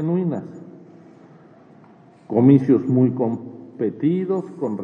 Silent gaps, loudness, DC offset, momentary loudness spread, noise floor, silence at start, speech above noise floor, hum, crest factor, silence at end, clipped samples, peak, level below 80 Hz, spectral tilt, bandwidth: none; -20 LUFS; under 0.1%; 17 LU; -49 dBFS; 0 s; 30 dB; none; 18 dB; 0 s; under 0.1%; -2 dBFS; -74 dBFS; -11 dB/octave; 3.9 kHz